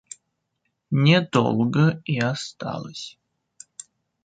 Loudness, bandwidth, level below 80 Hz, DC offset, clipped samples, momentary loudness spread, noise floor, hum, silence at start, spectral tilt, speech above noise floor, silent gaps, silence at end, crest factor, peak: -22 LUFS; 9.2 kHz; -62 dBFS; under 0.1%; under 0.1%; 24 LU; -76 dBFS; none; 0.9 s; -6 dB/octave; 55 dB; none; 1.15 s; 20 dB; -4 dBFS